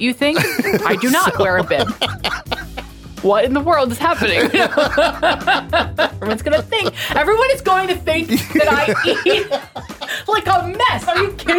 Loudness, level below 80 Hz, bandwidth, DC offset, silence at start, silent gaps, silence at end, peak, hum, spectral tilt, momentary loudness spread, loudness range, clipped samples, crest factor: -16 LUFS; -38 dBFS; 19 kHz; under 0.1%; 0 s; none; 0 s; -2 dBFS; none; -4 dB/octave; 9 LU; 2 LU; under 0.1%; 16 dB